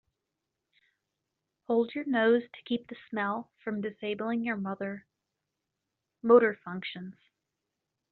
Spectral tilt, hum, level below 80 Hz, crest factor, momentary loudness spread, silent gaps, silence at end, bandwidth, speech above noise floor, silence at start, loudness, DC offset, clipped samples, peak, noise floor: -4 dB/octave; none; -78 dBFS; 22 dB; 16 LU; none; 1 s; 4.4 kHz; 57 dB; 1.7 s; -30 LUFS; under 0.1%; under 0.1%; -10 dBFS; -86 dBFS